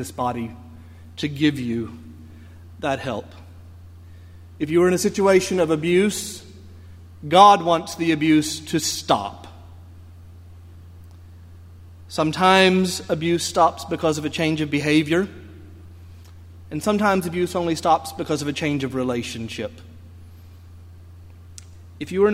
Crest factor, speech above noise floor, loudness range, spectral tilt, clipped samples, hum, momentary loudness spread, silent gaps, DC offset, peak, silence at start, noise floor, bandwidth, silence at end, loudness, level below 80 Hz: 22 dB; 23 dB; 10 LU; -4.5 dB/octave; under 0.1%; none; 17 LU; none; under 0.1%; 0 dBFS; 0 s; -43 dBFS; 16 kHz; 0 s; -20 LUFS; -52 dBFS